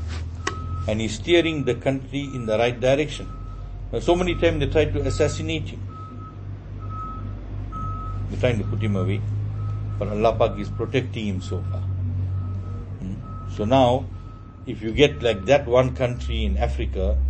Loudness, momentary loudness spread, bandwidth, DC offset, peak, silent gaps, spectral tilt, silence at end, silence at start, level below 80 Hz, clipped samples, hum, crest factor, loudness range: -24 LUFS; 15 LU; 8.8 kHz; under 0.1%; -2 dBFS; none; -6.5 dB/octave; 0 s; 0 s; -32 dBFS; under 0.1%; none; 22 dB; 6 LU